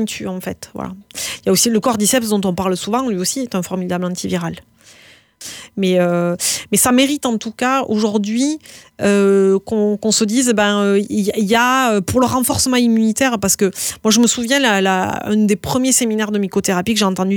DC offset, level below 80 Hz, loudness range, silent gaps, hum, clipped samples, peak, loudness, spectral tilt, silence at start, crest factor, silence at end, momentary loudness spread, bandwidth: under 0.1%; -50 dBFS; 6 LU; none; none; under 0.1%; -2 dBFS; -16 LUFS; -3.5 dB/octave; 0 s; 14 dB; 0 s; 10 LU; 20 kHz